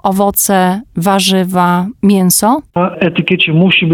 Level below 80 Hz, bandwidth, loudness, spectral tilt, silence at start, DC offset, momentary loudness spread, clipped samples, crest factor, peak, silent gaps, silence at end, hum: -44 dBFS; 18 kHz; -11 LUFS; -4.5 dB/octave; 0.05 s; under 0.1%; 5 LU; under 0.1%; 10 dB; 0 dBFS; none; 0 s; none